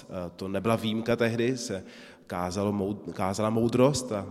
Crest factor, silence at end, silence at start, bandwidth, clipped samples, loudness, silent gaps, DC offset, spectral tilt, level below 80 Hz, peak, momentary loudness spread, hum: 20 dB; 0 s; 0 s; 14.5 kHz; under 0.1%; -28 LUFS; none; under 0.1%; -5.5 dB/octave; -58 dBFS; -8 dBFS; 14 LU; none